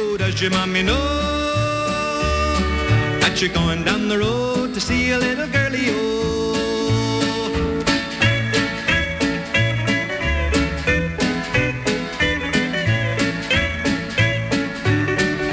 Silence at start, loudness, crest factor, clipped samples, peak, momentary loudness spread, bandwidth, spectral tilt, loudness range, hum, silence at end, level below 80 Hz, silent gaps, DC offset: 0 s; -19 LUFS; 12 dB; under 0.1%; -6 dBFS; 3 LU; 8 kHz; -5 dB/octave; 1 LU; none; 0 s; -32 dBFS; none; under 0.1%